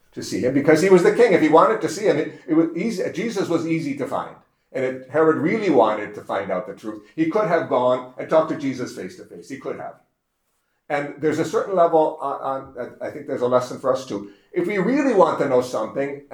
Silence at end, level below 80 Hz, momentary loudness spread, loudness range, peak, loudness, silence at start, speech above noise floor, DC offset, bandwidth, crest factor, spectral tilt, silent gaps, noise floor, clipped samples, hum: 0.15 s; -68 dBFS; 16 LU; 7 LU; -2 dBFS; -20 LUFS; 0.15 s; 51 dB; under 0.1%; 14 kHz; 20 dB; -6 dB/octave; none; -72 dBFS; under 0.1%; none